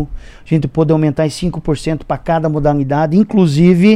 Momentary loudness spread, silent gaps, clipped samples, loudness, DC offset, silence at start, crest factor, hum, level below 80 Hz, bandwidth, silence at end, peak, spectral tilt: 9 LU; none; under 0.1%; -14 LUFS; under 0.1%; 0 s; 12 dB; none; -32 dBFS; 11 kHz; 0 s; 0 dBFS; -7.5 dB/octave